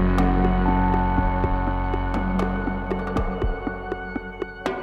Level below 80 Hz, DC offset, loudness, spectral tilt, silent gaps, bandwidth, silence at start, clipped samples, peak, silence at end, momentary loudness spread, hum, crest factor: -26 dBFS; under 0.1%; -24 LUFS; -8.5 dB/octave; none; 6.4 kHz; 0 s; under 0.1%; -6 dBFS; 0 s; 10 LU; none; 16 dB